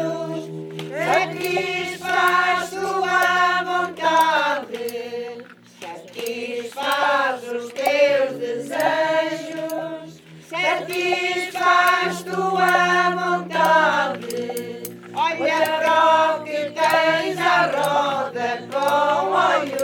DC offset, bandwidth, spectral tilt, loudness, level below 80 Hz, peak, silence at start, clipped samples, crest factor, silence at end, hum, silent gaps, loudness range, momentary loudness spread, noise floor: under 0.1%; 19.5 kHz; -3.5 dB/octave; -20 LUFS; -74 dBFS; -4 dBFS; 0 s; under 0.1%; 16 dB; 0 s; none; none; 5 LU; 13 LU; -41 dBFS